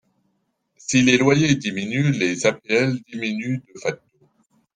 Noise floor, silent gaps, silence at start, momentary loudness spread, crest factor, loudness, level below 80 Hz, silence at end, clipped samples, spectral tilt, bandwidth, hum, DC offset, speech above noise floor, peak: -71 dBFS; none; 0.9 s; 13 LU; 18 dB; -20 LUFS; -58 dBFS; 0.8 s; under 0.1%; -5 dB/octave; 9.8 kHz; none; under 0.1%; 51 dB; -4 dBFS